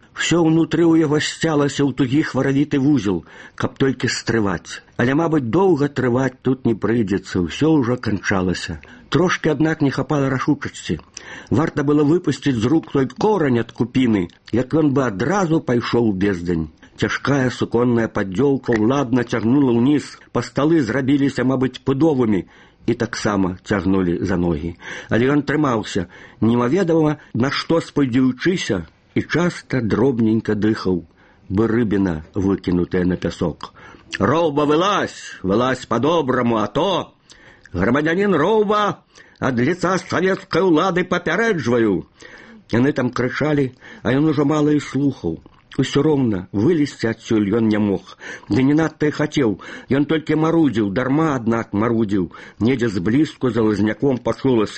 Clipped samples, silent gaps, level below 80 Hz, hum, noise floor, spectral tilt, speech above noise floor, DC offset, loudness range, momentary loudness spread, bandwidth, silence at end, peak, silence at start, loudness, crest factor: under 0.1%; none; -46 dBFS; none; -46 dBFS; -6.5 dB/octave; 28 dB; under 0.1%; 2 LU; 8 LU; 8.8 kHz; 0 s; -2 dBFS; 0.15 s; -19 LUFS; 18 dB